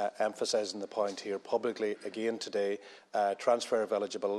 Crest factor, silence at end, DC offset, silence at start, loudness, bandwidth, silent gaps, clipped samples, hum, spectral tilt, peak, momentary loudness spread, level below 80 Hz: 18 dB; 0 s; under 0.1%; 0 s; -33 LUFS; 12.5 kHz; none; under 0.1%; none; -3 dB/octave; -14 dBFS; 6 LU; -88 dBFS